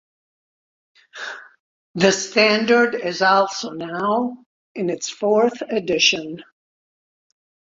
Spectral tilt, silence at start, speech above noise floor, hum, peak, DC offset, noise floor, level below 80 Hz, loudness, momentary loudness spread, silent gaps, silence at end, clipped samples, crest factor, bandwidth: -3 dB/octave; 1.15 s; over 71 dB; none; -2 dBFS; under 0.1%; under -90 dBFS; -64 dBFS; -19 LUFS; 17 LU; 1.60-1.94 s, 4.46-4.75 s; 1.3 s; under 0.1%; 20 dB; 7.8 kHz